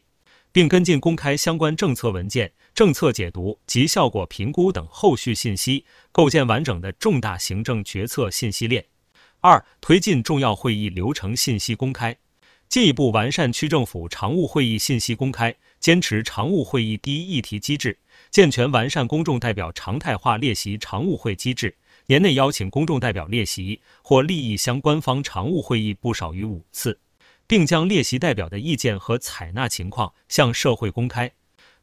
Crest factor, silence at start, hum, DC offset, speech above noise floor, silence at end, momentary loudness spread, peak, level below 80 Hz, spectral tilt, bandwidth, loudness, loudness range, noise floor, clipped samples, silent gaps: 20 dB; 0.55 s; none; under 0.1%; 39 dB; 0.55 s; 10 LU; 0 dBFS; -44 dBFS; -5 dB/octave; 16 kHz; -21 LUFS; 2 LU; -59 dBFS; under 0.1%; none